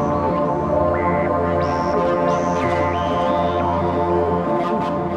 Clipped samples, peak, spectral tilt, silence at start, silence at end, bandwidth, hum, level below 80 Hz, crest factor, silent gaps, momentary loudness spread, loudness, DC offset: under 0.1%; -6 dBFS; -7.5 dB/octave; 0 s; 0 s; 9.4 kHz; none; -40 dBFS; 12 dB; none; 2 LU; -19 LUFS; 0.2%